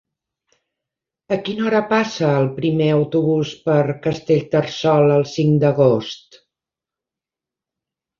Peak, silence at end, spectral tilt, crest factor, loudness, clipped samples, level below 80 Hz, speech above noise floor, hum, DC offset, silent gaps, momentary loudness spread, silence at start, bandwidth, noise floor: -2 dBFS; 2.05 s; -7 dB/octave; 18 dB; -18 LUFS; under 0.1%; -58 dBFS; 71 dB; none; under 0.1%; none; 8 LU; 1.3 s; 7.2 kHz; -88 dBFS